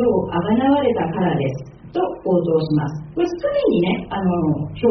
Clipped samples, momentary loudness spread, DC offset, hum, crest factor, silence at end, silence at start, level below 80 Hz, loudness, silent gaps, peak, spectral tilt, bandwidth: under 0.1%; 7 LU; under 0.1%; none; 14 dB; 0 s; 0 s; -46 dBFS; -20 LUFS; none; -6 dBFS; -7 dB/octave; 6.4 kHz